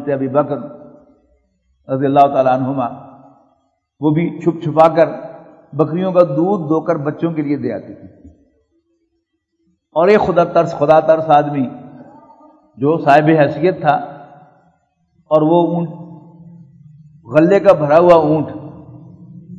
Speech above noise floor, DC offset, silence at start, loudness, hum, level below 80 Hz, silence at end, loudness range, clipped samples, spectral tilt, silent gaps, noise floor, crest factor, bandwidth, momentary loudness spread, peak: 56 dB; under 0.1%; 0 s; -14 LUFS; none; -56 dBFS; 0 s; 5 LU; 0.1%; -8.5 dB/octave; none; -69 dBFS; 16 dB; 7.6 kHz; 16 LU; 0 dBFS